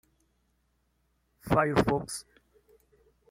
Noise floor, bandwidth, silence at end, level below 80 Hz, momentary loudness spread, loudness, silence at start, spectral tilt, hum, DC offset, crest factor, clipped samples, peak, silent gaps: -73 dBFS; 16.5 kHz; 1.1 s; -52 dBFS; 15 LU; -28 LUFS; 1.45 s; -5.5 dB/octave; none; under 0.1%; 24 dB; under 0.1%; -8 dBFS; none